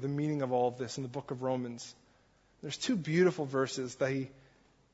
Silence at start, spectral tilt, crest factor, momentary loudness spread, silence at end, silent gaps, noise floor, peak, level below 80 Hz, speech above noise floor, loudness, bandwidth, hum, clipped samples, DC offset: 0 s; -5.5 dB/octave; 18 dB; 14 LU; 0.6 s; none; -67 dBFS; -16 dBFS; -72 dBFS; 34 dB; -33 LUFS; 8 kHz; none; under 0.1%; under 0.1%